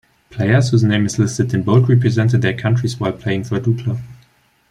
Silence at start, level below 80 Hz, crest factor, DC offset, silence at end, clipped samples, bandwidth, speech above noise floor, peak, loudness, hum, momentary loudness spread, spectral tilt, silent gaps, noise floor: 0.3 s; -50 dBFS; 14 dB; under 0.1%; 0.55 s; under 0.1%; 10.5 kHz; 40 dB; -2 dBFS; -16 LUFS; none; 8 LU; -6.5 dB/octave; none; -55 dBFS